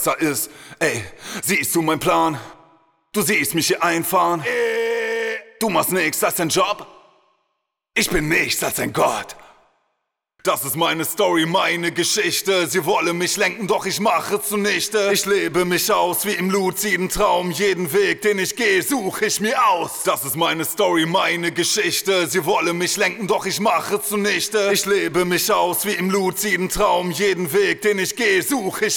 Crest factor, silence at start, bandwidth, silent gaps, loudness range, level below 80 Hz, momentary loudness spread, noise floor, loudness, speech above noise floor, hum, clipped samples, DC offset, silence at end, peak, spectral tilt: 16 dB; 0 s; over 20 kHz; none; 3 LU; -48 dBFS; 4 LU; -76 dBFS; -19 LUFS; 56 dB; none; under 0.1%; under 0.1%; 0 s; -4 dBFS; -3 dB/octave